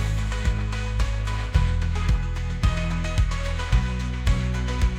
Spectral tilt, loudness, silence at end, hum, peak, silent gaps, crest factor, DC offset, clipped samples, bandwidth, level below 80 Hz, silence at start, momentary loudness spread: -5.5 dB/octave; -26 LUFS; 0 s; none; -6 dBFS; none; 16 dB; under 0.1%; under 0.1%; 11 kHz; -24 dBFS; 0 s; 3 LU